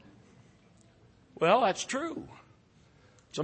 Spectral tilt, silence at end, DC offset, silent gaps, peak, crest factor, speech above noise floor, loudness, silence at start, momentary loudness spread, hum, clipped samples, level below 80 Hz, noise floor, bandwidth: -4 dB/octave; 0 s; under 0.1%; none; -10 dBFS; 22 dB; 33 dB; -29 LUFS; 1.35 s; 19 LU; none; under 0.1%; -70 dBFS; -62 dBFS; 8.8 kHz